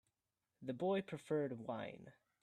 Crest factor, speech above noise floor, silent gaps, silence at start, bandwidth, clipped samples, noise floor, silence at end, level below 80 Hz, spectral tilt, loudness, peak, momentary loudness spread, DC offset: 16 dB; over 48 dB; none; 0.6 s; 12.5 kHz; under 0.1%; under -90 dBFS; 0.3 s; -84 dBFS; -7 dB/octave; -43 LUFS; -28 dBFS; 12 LU; under 0.1%